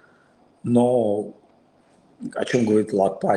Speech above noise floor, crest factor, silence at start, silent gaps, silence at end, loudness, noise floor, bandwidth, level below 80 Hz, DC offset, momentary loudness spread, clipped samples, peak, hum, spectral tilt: 37 dB; 18 dB; 0.65 s; none; 0 s; -21 LUFS; -58 dBFS; 11 kHz; -66 dBFS; under 0.1%; 15 LU; under 0.1%; -6 dBFS; none; -7 dB/octave